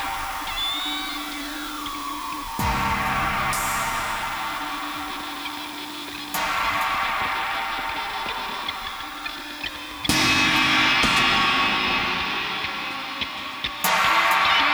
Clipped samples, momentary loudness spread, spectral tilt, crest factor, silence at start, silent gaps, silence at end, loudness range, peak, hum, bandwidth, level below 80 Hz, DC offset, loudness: under 0.1%; 13 LU; -2 dB/octave; 18 dB; 0 s; none; 0 s; 7 LU; -8 dBFS; none; over 20 kHz; -44 dBFS; under 0.1%; -23 LUFS